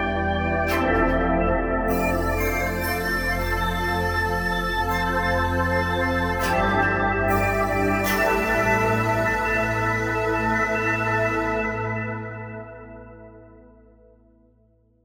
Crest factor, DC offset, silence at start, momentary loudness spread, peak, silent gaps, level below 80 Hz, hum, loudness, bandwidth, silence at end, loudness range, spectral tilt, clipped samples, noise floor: 16 dB; under 0.1%; 0 s; 5 LU; -6 dBFS; none; -34 dBFS; none; -22 LUFS; over 20 kHz; 1.5 s; 6 LU; -5.5 dB/octave; under 0.1%; -60 dBFS